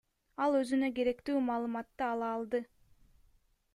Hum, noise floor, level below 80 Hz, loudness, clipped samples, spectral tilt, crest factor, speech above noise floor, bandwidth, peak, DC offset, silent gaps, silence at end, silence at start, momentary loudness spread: none; -69 dBFS; -68 dBFS; -34 LUFS; under 0.1%; -5 dB/octave; 16 dB; 36 dB; 12 kHz; -20 dBFS; under 0.1%; none; 1.1 s; 0.4 s; 8 LU